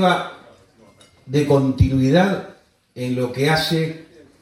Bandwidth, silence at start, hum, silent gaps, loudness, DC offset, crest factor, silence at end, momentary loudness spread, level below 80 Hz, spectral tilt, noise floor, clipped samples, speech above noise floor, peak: 16 kHz; 0 s; none; none; -19 LUFS; under 0.1%; 18 dB; 0.4 s; 14 LU; -38 dBFS; -6.5 dB/octave; -51 dBFS; under 0.1%; 33 dB; -2 dBFS